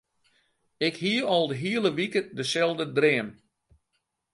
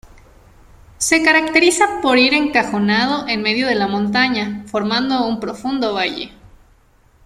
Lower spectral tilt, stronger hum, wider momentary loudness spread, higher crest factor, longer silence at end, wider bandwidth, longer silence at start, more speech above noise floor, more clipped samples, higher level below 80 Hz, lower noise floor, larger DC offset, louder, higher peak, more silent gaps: first, -4.5 dB/octave vs -3 dB/octave; neither; second, 6 LU vs 10 LU; about the same, 20 dB vs 16 dB; first, 1 s vs 0.8 s; second, 11.5 kHz vs 14.5 kHz; second, 0.8 s vs 1 s; first, 52 dB vs 36 dB; neither; second, -72 dBFS vs -50 dBFS; first, -78 dBFS vs -53 dBFS; neither; second, -26 LUFS vs -16 LUFS; second, -8 dBFS vs -2 dBFS; neither